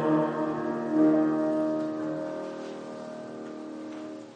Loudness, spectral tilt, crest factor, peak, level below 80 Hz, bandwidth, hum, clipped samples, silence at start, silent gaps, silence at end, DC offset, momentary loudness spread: -29 LUFS; -8 dB/octave; 16 dB; -12 dBFS; -74 dBFS; 8.6 kHz; none; under 0.1%; 0 s; none; 0 s; under 0.1%; 16 LU